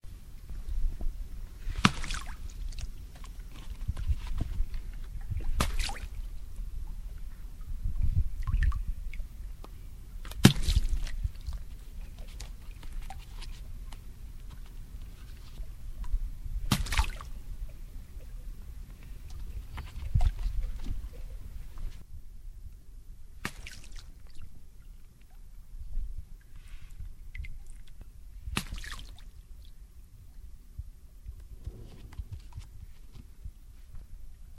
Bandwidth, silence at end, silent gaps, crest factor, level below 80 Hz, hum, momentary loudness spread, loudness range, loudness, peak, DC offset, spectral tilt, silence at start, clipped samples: 15.5 kHz; 0 s; none; 34 dB; -36 dBFS; none; 21 LU; 17 LU; -37 LUFS; 0 dBFS; under 0.1%; -4.5 dB/octave; 0.05 s; under 0.1%